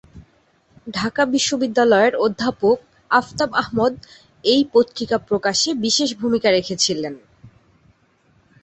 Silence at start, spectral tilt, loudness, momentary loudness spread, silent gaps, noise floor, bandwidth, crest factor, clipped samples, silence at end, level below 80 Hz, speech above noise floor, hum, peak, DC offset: 0.15 s; -3 dB/octave; -19 LUFS; 9 LU; none; -59 dBFS; 8.4 kHz; 18 dB; under 0.1%; 1.15 s; -54 dBFS; 40 dB; none; -2 dBFS; under 0.1%